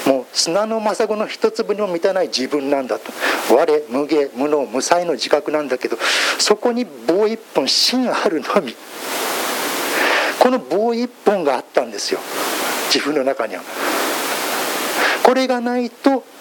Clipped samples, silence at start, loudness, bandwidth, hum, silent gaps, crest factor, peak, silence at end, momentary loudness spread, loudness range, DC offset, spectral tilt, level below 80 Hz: under 0.1%; 0 s; -18 LUFS; 17.5 kHz; none; none; 18 dB; 0 dBFS; 0 s; 7 LU; 2 LU; under 0.1%; -2 dB/octave; -74 dBFS